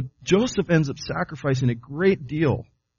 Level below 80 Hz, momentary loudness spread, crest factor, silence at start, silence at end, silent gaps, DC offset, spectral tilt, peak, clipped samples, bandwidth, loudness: -50 dBFS; 7 LU; 18 dB; 0 s; 0.35 s; none; under 0.1%; -6 dB/octave; -6 dBFS; under 0.1%; 7.2 kHz; -23 LUFS